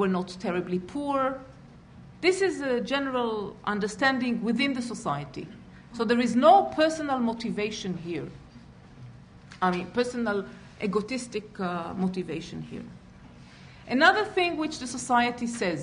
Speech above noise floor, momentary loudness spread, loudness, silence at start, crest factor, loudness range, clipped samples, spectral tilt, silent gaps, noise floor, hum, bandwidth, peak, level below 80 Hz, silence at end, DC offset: 23 dB; 17 LU; -27 LUFS; 0 s; 20 dB; 7 LU; under 0.1%; -5 dB/octave; none; -49 dBFS; none; 10.5 kHz; -6 dBFS; -58 dBFS; 0 s; under 0.1%